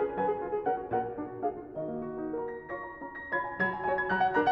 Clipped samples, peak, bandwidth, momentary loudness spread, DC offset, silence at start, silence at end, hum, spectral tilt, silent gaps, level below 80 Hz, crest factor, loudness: under 0.1%; -16 dBFS; 5.8 kHz; 11 LU; under 0.1%; 0 s; 0 s; none; -8 dB/octave; none; -60 dBFS; 16 dB; -33 LUFS